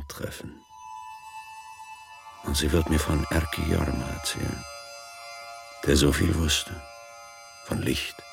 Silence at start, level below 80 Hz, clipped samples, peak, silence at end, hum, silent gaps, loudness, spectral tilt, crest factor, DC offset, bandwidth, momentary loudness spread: 0 s; -36 dBFS; under 0.1%; -8 dBFS; 0 s; none; none; -26 LUFS; -4.5 dB/octave; 20 dB; under 0.1%; 16.5 kHz; 21 LU